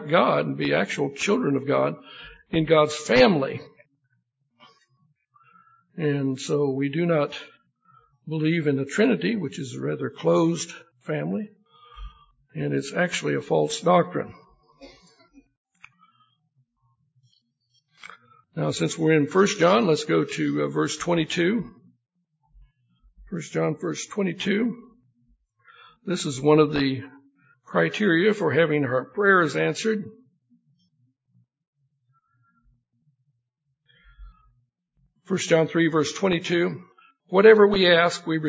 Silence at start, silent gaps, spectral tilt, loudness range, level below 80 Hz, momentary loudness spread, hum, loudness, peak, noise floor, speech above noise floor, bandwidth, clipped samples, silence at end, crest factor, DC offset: 0 s; 15.57-15.65 s, 31.67-31.73 s; -5.5 dB/octave; 7 LU; -58 dBFS; 14 LU; none; -23 LUFS; -2 dBFS; -77 dBFS; 55 dB; 8 kHz; under 0.1%; 0 s; 22 dB; under 0.1%